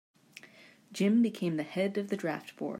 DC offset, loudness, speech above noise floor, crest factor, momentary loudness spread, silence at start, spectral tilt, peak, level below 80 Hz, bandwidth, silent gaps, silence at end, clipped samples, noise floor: under 0.1%; -31 LUFS; 26 dB; 16 dB; 24 LU; 0.45 s; -6.5 dB/octave; -18 dBFS; -82 dBFS; 15.5 kHz; none; 0 s; under 0.1%; -57 dBFS